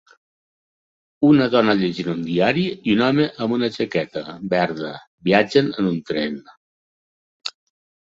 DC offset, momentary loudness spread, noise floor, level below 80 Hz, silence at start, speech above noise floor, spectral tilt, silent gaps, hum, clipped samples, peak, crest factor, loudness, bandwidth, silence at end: under 0.1%; 14 LU; under -90 dBFS; -58 dBFS; 1.2 s; over 71 dB; -7 dB/octave; 5.07-5.18 s, 6.57-7.40 s; none; under 0.1%; -2 dBFS; 20 dB; -20 LUFS; 7.8 kHz; 0.5 s